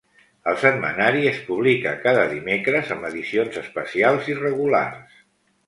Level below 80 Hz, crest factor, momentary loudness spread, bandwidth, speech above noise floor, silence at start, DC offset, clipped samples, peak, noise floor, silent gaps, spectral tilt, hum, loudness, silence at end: -62 dBFS; 22 dB; 8 LU; 11.5 kHz; 39 dB; 0.45 s; under 0.1%; under 0.1%; 0 dBFS; -60 dBFS; none; -6 dB/octave; none; -21 LUFS; 0.65 s